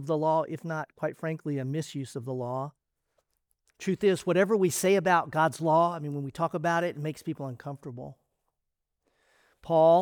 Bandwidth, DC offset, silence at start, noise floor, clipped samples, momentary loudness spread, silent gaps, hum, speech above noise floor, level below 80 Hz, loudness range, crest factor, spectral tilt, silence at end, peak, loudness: over 20 kHz; under 0.1%; 0 s; -84 dBFS; under 0.1%; 14 LU; none; none; 56 dB; -70 dBFS; 9 LU; 18 dB; -5.5 dB/octave; 0 s; -10 dBFS; -28 LUFS